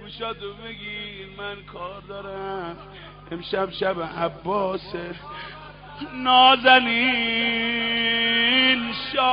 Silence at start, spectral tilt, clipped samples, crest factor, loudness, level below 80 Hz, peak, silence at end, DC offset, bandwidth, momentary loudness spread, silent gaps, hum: 0 s; 0 dB/octave; under 0.1%; 20 dB; -20 LUFS; -52 dBFS; -2 dBFS; 0 s; under 0.1%; 5.2 kHz; 21 LU; none; 50 Hz at -50 dBFS